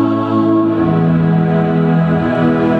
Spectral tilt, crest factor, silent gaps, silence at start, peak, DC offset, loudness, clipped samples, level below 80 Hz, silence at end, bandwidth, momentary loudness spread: -10 dB/octave; 10 dB; none; 0 s; -2 dBFS; under 0.1%; -13 LUFS; under 0.1%; -42 dBFS; 0 s; 4.7 kHz; 1 LU